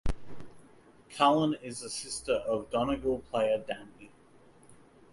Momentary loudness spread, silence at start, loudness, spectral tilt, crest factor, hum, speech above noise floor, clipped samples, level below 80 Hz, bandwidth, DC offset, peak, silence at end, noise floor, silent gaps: 20 LU; 0.05 s; -31 LUFS; -4.5 dB/octave; 22 dB; none; 28 dB; under 0.1%; -46 dBFS; 11.5 kHz; under 0.1%; -10 dBFS; 0.4 s; -58 dBFS; none